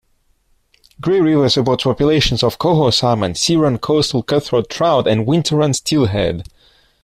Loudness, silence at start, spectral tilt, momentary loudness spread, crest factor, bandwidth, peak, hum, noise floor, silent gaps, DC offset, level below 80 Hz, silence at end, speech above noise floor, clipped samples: -15 LUFS; 1 s; -5.5 dB/octave; 5 LU; 14 dB; 14.5 kHz; -2 dBFS; none; -59 dBFS; none; under 0.1%; -38 dBFS; 0.6 s; 44 dB; under 0.1%